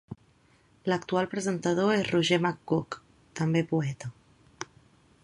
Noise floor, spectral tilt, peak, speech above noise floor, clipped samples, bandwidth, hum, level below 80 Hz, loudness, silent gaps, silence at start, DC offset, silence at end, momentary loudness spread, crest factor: -63 dBFS; -5.5 dB/octave; -8 dBFS; 35 dB; under 0.1%; 11 kHz; none; -64 dBFS; -28 LUFS; none; 0.1 s; under 0.1%; 0.6 s; 18 LU; 20 dB